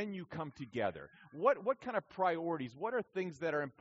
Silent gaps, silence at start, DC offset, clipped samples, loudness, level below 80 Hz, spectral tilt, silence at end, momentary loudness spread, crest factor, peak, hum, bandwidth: none; 0 s; under 0.1%; under 0.1%; -37 LUFS; -76 dBFS; -4.5 dB/octave; 0.1 s; 11 LU; 22 dB; -16 dBFS; none; 7.6 kHz